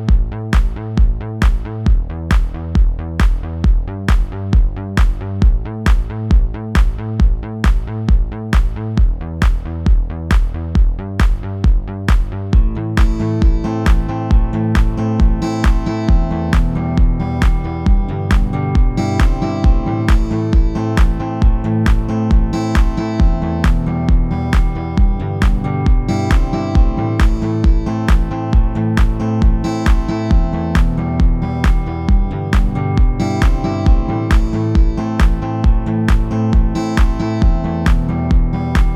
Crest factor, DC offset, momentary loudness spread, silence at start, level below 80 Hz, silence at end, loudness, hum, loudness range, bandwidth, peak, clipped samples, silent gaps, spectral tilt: 14 dB; under 0.1%; 2 LU; 0 s; -14 dBFS; 0 s; -17 LUFS; none; 2 LU; 8.2 kHz; 0 dBFS; under 0.1%; none; -7.5 dB/octave